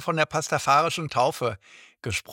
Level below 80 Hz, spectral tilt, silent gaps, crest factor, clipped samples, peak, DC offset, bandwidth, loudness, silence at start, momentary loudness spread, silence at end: -60 dBFS; -4 dB/octave; none; 20 dB; under 0.1%; -6 dBFS; under 0.1%; 18 kHz; -24 LUFS; 0 s; 11 LU; 0 s